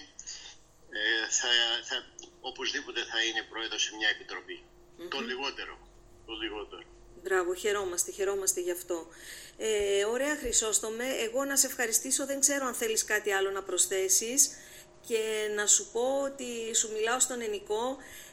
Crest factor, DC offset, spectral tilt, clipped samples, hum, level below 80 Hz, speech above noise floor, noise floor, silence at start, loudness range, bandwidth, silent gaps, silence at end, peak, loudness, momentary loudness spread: 24 dB; under 0.1%; 0.5 dB/octave; under 0.1%; none; -60 dBFS; 21 dB; -52 dBFS; 0 s; 7 LU; 16.5 kHz; none; 0 s; -8 dBFS; -29 LUFS; 18 LU